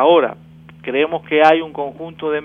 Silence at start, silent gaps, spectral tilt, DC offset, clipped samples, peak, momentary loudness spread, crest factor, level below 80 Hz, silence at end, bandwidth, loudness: 0 s; none; -6.5 dB/octave; under 0.1%; under 0.1%; 0 dBFS; 14 LU; 16 dB; -58 dBFS; 0 s; 7 kHz; -17 LUFS